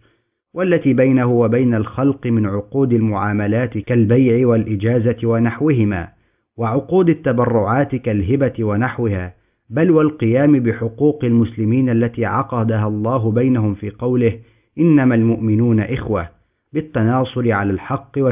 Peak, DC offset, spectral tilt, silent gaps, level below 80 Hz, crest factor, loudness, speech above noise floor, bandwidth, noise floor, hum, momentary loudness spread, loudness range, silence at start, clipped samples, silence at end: -2 dBFS; under 0.1%; -12.5 dB/octave; none; -42 dBFS; 14 dB; -17 LUFS; 46 dB; 3.8 kHz; -61 dBFS; none; 9 LU; 2 LU; 0.55 s; under 0.1%; 0 s